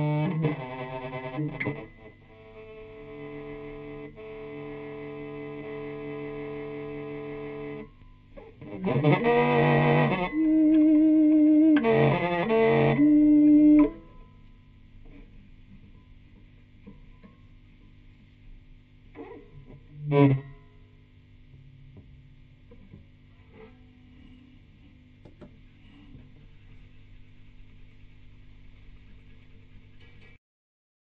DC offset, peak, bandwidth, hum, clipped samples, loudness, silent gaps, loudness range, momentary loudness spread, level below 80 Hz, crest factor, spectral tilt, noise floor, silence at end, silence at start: under 0.1%; -6 dBFS; 4.3 kHz; none; under 0.1%; -23 LUFS; none; 19 LU; 23 LU; -52 dBFS; 22 dB; -10.5 dB/octave; -54 dBFS; 2 s; 0 s